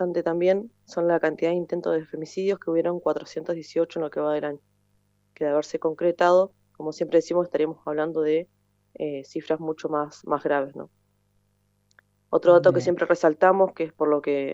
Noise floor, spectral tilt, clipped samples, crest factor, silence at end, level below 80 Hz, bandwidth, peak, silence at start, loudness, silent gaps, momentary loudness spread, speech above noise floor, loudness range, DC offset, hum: -68 dBFS; -6.5 dB/octave; under 0.1%; 18 dB; 0 s; -72 dBFS; 7.8 kHz; -6 dBFS; 0 s; -24 LUFS; none; 13 LU; 45 dB; 6 LU; under 0.1%; 50 Hz at -65 dBFS